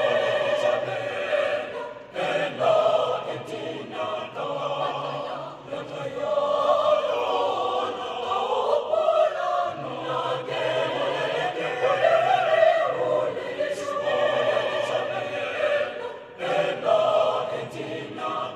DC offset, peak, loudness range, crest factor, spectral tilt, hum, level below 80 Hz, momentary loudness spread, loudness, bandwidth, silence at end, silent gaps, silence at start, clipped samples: under 0.1%; -8 dBFS; 4 LU; 16 dB; -4.5 dB/octave; none; -70 dBFS; 12 LU; -25 LUFS; 10.5 kHz; 0 s; none; 0 s; under 0.1%